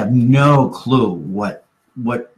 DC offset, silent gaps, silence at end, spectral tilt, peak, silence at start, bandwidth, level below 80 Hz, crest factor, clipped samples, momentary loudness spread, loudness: under 0.1%; none; 0.15 s; -8 dB/octave; -2 dBFS; 0 s; 9.6 kHz; -52 dBFS; 14 dB; under 0.1%; 13 LU; -16 LUFS